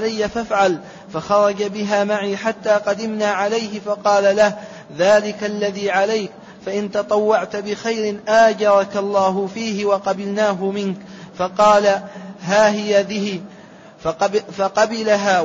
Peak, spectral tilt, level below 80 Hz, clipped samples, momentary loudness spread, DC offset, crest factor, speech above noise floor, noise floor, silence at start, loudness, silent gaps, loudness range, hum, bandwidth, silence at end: -4 dBFS; -4.5 dB/octave; -56 dBFS; under 0.1%; 12 LU; under 0.1%; 16 dB; 24 dB; -42 dBFS; 0 s; -18 LUFS; none; 2 LU; none; 7.8 kHz; 0 s